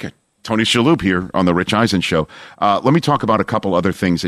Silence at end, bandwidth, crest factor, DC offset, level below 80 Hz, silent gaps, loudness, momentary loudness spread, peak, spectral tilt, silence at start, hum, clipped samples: 0 s; 14.5 kHz; 14 dB; under 0.1%; -46 dBFS; none; -16 LUFS; 7 LU; -2 dBFS; -5.5 dB/octave; 0 s; none; under 0.1%